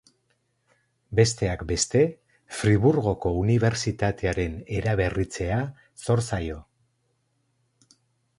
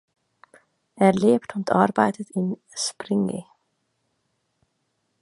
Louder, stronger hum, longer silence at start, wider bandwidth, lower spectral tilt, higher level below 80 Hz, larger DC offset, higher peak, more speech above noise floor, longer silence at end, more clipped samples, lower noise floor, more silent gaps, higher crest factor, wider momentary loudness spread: about the same, -25 LUFS vs -23 LUFS; neither; first, 1.1 s vs 0.95 s; about the same, 11.5 kHz vs 11.5 kHz; about the same, -5.5 dB/octave vs -5.5 dB/octave; first, -42 dBFS vs -66 dBFS; neither; about the same, -4 dBFS vs -2 dBFS; second, 48 dB vs 52 dB; about the same, 1.75 s vs 1.8 s; neither; about the same, -72 dBFS vs -74 dBFS; neither; about the same, 22 dB vs 22 dB; about the same, 9 LU vs 10 LU